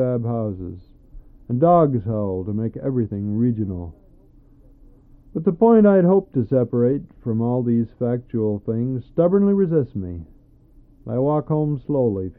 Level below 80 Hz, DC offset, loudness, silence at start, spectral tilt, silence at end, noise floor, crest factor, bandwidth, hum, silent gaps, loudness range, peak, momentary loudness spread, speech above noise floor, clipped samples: -48 dBFS; under 0.1%; -20 LUFS; 0 s; -14 dB/octave; 0.05 s; -50 dBFS; 16 dB; 3.8 kHz; none; none; 5 LU; -4 dBFS; 13 LU; 31 dB; under 0.1%